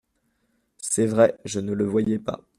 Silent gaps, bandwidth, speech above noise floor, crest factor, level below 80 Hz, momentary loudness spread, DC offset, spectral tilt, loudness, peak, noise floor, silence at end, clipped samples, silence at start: none; 14.5 kHz; 48 dB; 20 dB; -60 dBFS; 10 LU; under 0.1%; -5.5 dB/octave; -23 LUFS; -4 dBFS; -71 dBFS; 0.2 s; under 0.1%; 0.8 s